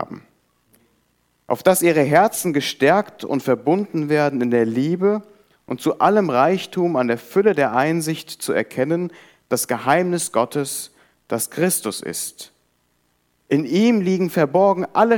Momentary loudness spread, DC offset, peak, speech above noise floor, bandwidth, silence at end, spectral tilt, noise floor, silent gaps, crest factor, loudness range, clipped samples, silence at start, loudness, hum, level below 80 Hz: 11 LU; under 0.1%; -2 dBFS; 47 dB; 19 kHz; 0 s; -5 dB/octave; -66 dBFS; none; 18 dB; 4 LU; under 0.1%; 0 s; -19 LUFS; 60 Hz at -50 dBFS; -68 dBFS